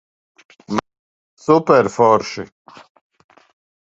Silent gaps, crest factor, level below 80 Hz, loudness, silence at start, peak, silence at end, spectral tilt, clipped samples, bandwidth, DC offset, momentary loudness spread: 0.99-1.37 s; 20 dB; -60 dBFS; -16 LUFS; 0.7 s; 0 dBFS; 1.5 s; -6 dB/octave; under 0.1%; 8 kHz; under 0.1%; 17 LU